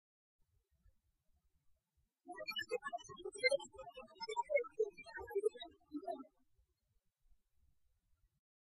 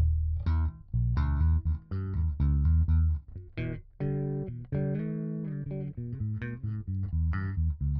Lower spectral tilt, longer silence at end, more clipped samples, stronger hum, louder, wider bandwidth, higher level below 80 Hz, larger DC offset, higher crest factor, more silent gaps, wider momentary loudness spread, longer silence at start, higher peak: second, -2 dB/octave vs -10 dB/octave; first, 2.5 s vs 0 s; neither; neither; second, -42 LUFS vs -31 LUFS; first, 11.5 kHz vs 3.9 kHz; second, -76 dBFS vs -32 dBFS; neither; first, 24 dB vs 12 dB; neither; first, 18 LU vs 10 LU; first, 2.25 s vs 0 s; second, -22 dBFS vs -16 dBFS